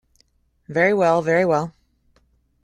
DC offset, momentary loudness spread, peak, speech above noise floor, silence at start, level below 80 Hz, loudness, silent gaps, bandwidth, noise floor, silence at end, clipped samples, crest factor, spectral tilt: under 0.1%; 10 LU; -4 dBFS; 45 dB; 0.7 s; -58 dBFS; -19 LUFS; none; 11.5 kHz; -63 dBFS; 0.95 s; under 0.1%; 18 dB; -6.5 dB/octave